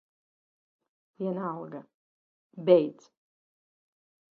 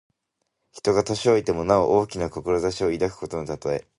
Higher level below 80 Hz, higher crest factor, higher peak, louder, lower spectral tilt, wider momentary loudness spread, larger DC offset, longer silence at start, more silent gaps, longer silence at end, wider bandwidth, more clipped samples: second, -82 dBFS vs -48 dBFS; about the same, 24 dB vs 20 dB; second, -8 dBFS vs -4 dBFS; second, -27 LUFS vs -23 LUFS; first, -8.5 dB/octave vs -5.5 dB/octave; first, 19 LU vs 9 LU; neither; first, 1.2 s vs 0.75 s; first, 1.94-2.50 s vs none; first, 1.4 s vs 0.15 s; second, 6.8 kHz vs 11.5 kHz; neither